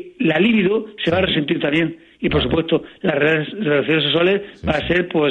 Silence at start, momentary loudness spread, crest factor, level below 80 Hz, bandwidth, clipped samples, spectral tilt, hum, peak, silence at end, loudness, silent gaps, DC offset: 0 s; 6 LU; 14 dB; -40 dBFS; 8.4 kHz; under 0.1%; -7.5 dB/octave; none; -4 dBFS; 0 s; -18 LUFS; none; under 0.1%